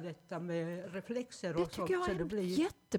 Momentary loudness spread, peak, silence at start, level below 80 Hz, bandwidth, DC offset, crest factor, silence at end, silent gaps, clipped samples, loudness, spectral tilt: 8 LU; -22 dBFS; 0 s; -60 dBFS; 18 kHz; under 0.1%; 16 dB; 0 s; none; under 0.1%; -37 LUFS; -6 dB/octave